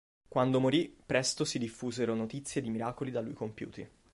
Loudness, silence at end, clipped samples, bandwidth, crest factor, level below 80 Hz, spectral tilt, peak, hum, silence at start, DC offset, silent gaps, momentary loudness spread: -33 LUFS; 0.25 s; under 0.1%; 11.5 kHz; 20 dB; -66 dBFS; -4.5 dB/octave; -14 dBFS; none; 0.3 s; under 0.1%; none; 12 LU